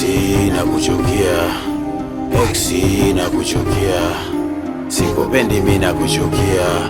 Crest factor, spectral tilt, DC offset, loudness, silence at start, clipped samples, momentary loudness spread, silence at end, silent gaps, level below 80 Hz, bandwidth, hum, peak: 16 dB; -5 dB/octave; under 0.1%; -16 LUFS; 0 s; under 0.1%; 7 LU; 0 s; none; -30 dBFS; 19 kHz; none; 0 dBFS